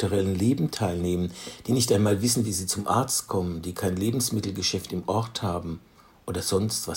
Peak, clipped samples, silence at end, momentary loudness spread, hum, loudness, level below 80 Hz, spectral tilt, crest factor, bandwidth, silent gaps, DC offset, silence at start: -8 dBFS; under 0.1%; 0 s; 10 LU; none; -26 LUFS; -56 dBFS; -4.5 dB/octave; 18 dB; 16.5 kHz; none; under 0.1%; 0 s